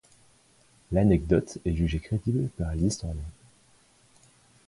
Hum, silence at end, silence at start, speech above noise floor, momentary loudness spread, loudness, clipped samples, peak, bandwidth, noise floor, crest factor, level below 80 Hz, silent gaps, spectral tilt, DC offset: none; 1.35 s; 0.9 s; 35 dB; 12 LU; -27 LUFS; under 0.1%; -8 dBFS; 11.5 kHz; -61 dBFS; 20 dB; -40 dBFS; none; -7 dB/octave; under 0.1%